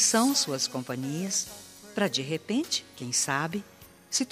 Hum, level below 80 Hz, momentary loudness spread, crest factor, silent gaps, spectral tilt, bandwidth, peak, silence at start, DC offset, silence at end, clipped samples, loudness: none; -70 dBFS; 11 LU; 18 dB; none; -2.5 dB/octave; 15.5 kHz; -10 dBFS; 0 s; under 0.1%; 0 s; under 0.1%; -28 LUFS